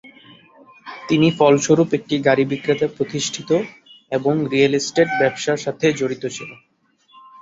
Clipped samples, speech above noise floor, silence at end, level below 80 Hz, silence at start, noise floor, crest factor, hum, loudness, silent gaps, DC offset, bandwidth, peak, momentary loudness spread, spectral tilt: under 0.1%; 38 dB; 0.85 s; -60 dBFS; 0.05 s; -56 dBFS; 18 dB; none; -19 LUFS; none; under 0.1%; 8 kHz; -2 dBFS; 12 LU; -5 dB/octave